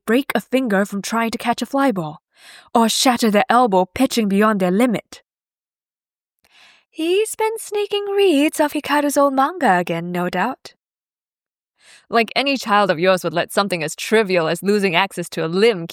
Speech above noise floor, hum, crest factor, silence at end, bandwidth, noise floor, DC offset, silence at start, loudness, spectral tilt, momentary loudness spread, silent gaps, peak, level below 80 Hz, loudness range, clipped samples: over 72 dB; none; 18 dB; 0 s; 18.5 kHz; under -90 dBFS; under 0.1%; 0.05 s; -18 LUFS; -4.5 dB/octave; 7 LU; 11.61-11.65 s; 0 dBFS; -62 dBFS; 5 LU; under 0.1%